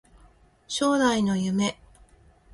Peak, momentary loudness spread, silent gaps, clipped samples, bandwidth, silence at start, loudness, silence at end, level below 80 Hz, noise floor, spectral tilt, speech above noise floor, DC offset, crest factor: -10 dBFS; 7 LU; none; under 0.1%; 11.5 kHz; 0.7 s; -25 LUFS; 0.8 s; -56 dBFS; -57 dBFS; -4.5 dB/octave; 33 dB; under 0.1%; 18 dB